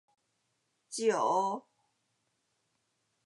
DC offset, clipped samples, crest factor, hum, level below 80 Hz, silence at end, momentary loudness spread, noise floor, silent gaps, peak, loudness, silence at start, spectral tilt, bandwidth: under 0.1%; under 0.1%; 20 dB; none; under -90 dBFS; 1.65 s; 14 LU; -79 dBFS; none; -16 dBFS; -31 LUFS; 0.9 s; -3.5 dB/octave; 11.5 kHz